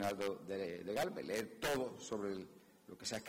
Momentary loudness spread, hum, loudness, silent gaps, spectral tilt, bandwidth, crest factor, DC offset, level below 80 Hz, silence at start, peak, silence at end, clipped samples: 11 LU; none; -42 LUFS; none; -4 dB/octave; 16 kHz; 16 dB; under 0.1%; -70 dBFS; 0 s; -26 dBFS; 0 s; under 0.1%